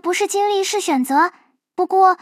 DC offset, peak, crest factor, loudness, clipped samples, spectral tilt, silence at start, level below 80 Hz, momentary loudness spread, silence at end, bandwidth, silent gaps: under 0.1%; -4 dBFS; 14 dB; -18 LUFS; under 0.1%; -1 dB/octave; 0.05 s; -82 dBFS; 7 LU; 0.05 s; 16 kHz; none